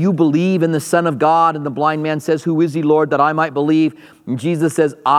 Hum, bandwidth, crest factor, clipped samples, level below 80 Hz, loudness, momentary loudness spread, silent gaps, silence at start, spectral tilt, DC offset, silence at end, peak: none; 14 kHz; 14 dB; under 0.1%; -70 dBFS; -16 LUFS; 6 LU; none; 0 s; -6.5 dB/octave; under 0.1%; 0 s; 0 dBFS